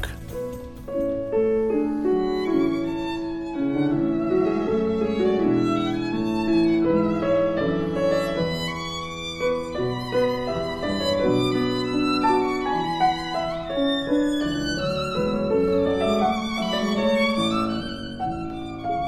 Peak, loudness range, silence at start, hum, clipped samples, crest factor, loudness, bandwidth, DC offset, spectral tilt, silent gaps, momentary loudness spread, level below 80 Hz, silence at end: -10 dBFS; 3 LU; 0 s; none; under 0.1%; 14 dB; -23 LUFS; 14.5 kHz; under 0.1%; -6 dB/octave; none; 8 LU; -44 dBFS; 0 s